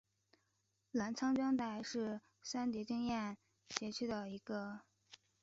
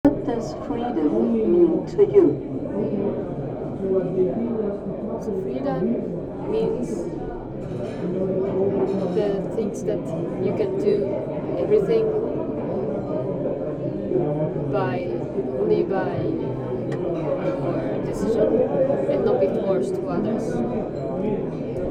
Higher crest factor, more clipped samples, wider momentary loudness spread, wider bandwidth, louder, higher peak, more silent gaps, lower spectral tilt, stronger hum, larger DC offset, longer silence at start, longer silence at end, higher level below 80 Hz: first, 26 dB vs 18 dB; neither; about the same, 10 LU vs 8 LU; second, 7.6 kHz vs 9.8 kHz; second, -41 LUFS vs -24 LUFS; second, -16 dBFS vs -4 dBFS; neither; second, -4 dB/octave vs -8.5 dB/octave; neither; neither; first, 0.95 s vs 0.05 s; first, 0.3 s vs 0 s; second, -76 dBFS vs -46 dBFS